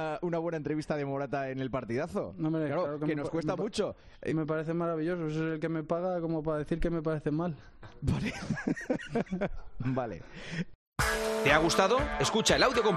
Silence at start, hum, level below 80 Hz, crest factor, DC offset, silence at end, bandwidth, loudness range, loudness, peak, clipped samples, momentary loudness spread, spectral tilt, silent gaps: 0 s; none; -48 dBFS; 22 dB; under 0.1%; 0 s; 13.5 kHz; 5 LU; -31 LUFS; -10 dBFS; under 0.1%; 11 LU; -5 dB/octave; 10.75-10.92 s